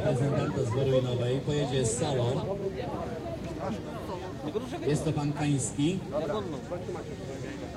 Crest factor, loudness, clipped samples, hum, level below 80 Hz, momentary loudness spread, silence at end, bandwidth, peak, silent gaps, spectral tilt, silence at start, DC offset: 16 dB; -31 LUFS; under 0.1%; none; -50 dBFS; 10 LU; 0 s; 13 kHz; -16 dBFS; none; -6 dB/octave; 0 s; under 0.1%